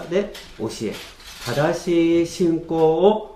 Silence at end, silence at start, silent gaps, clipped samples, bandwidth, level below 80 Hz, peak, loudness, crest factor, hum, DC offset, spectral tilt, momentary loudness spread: 0 s; 0 s; none; under 0.1%; 15 kHz; -48 dBFS; -2 dBFS; -21 LUFS; 18 dB; none; under 0.1%; -6 dB/octave; 15 LU